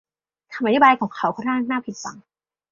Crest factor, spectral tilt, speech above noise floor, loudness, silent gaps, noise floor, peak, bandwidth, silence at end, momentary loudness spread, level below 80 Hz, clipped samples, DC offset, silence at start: 20 dB; -4.5 dB/octave; 26 dB; -20 LUFS; none; -47 dBFS; -2 dBFS; 7.6 kHz; 0.5 s; 19 LU; -66 dBFS; under 0.1%; under 0.1%; 0.5 s